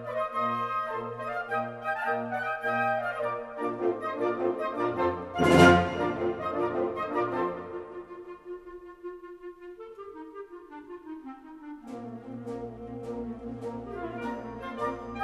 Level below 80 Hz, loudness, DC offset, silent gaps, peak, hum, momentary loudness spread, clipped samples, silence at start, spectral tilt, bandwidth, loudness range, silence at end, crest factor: -56 dBFS; -29 LUFS; under 0.1%; none; -6 dBFS; none; 17 LU; under 0.1%; 0 s; -6 dB/octave; 13.5 kHz; 18 LU; 0 s; 24 dB